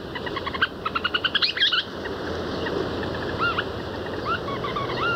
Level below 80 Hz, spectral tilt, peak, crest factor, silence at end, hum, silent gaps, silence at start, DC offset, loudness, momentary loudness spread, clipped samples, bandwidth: -46 dBFS; -5 dB/octave; -8 dBFS; 18 dB; 0 s; none; none; 0 s; under 0.1%; -25 LUFS; 10 LU; under 0.1%; 16 kHz